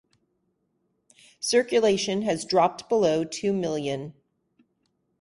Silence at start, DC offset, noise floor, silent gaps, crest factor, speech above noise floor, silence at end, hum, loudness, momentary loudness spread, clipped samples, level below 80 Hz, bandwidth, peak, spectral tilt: 1.4 s; under 0.1%; -74 dBFS; none; 20 dB; 49 dB; 1.1 s; none; -25 LUFS; 10 LU; under 0.1%; -66 dBFS; 11.5 kHz; -8 dBFS; -4 dB/octave